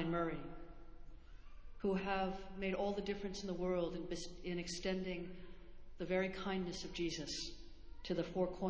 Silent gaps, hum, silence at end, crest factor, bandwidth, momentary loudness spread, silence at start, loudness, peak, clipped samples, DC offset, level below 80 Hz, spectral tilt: none; none; 0 s; 18 dB; 8 kHz; 21 LU; 0 s; -42 LUFS; -24 dBFS; under 0.1%; under 0.1%; -56 dBFS; -5 dB/octave